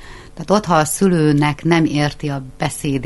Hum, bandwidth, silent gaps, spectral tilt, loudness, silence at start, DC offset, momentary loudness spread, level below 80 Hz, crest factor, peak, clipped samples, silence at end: none; 12 kHz; none; -5.5 dB/octave; -17 LUFS; 0 s; under 0.1%; 11 LU; -40 dBFS; 16 dB; 0 dBFS; under 0.1%; 0 s